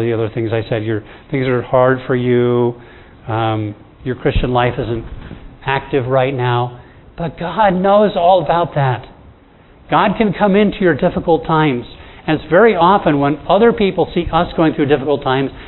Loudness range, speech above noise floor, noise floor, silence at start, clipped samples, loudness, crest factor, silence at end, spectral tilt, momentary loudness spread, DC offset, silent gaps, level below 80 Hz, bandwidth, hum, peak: 5 LU; 30 dB; -45 dBFS; 0 s; under 0.1%; -15 LUFS; 16 dB; 0 s; -11 dB/octave; 13 LU; under 0.1%; none; -34 dBFS; 4.2 kHz; none; 0 dBFS